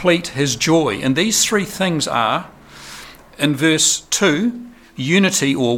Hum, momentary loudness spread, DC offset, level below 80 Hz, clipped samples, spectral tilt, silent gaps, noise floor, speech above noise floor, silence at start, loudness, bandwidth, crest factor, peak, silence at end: none; 20 LU; under 0.1%; -50 dBFS; under 0.1%; -3.5 dB/octave; none; -38 dBFS; 21 dB; 0 s; -16 LUFS; 18 kHz; 16 dB; -2 dBFS; 0 s